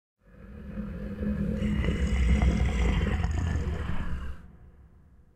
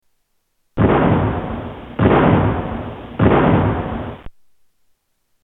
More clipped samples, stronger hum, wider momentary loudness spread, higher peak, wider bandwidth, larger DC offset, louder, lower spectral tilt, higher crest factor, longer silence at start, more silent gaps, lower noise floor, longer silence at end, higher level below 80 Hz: neither; neither; about the same, 16 LU vs 16 LU; second, -12 dBFS vs 0 dBFS; first, 8.8 kHz vs 4 kHz; neither; second, -30 LUFS vs -17 LUFS; second, -7 dB/octave vs -10.5 dB/octave; about the same, 16 dB vs 18 dB; second, 0.35 s vs 0.75 s; neither; second, -55 dBFS vs -66 dBFS; second, 0.5 s vs 1.15 s; about the same, -30 dBFS vs -32 dBFS